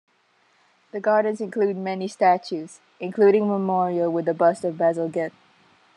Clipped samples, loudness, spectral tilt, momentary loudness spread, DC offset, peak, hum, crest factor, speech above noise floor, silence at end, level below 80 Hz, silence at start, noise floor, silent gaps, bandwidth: under 0.1%; -22 LUFS; -7 dB/octave; 14 LU; under 0.1%; -6 dBFS; none; 16 dB; 41 dB; 0.7 s; -80 dBFS; 0.95 s; -63 dBFS; none; 10.5 kHz